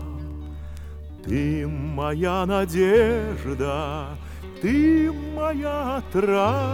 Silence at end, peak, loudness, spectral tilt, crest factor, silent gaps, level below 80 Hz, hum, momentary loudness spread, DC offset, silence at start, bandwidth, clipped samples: 0 s; -8 dBFS; -23 LUFS; -7 dB/octave; 16 dB; none; -36 dBFS; 50 Hz at -45 dBFS; 18 LU; under 0.1%; 0 s; 17 kHz; under 0.1%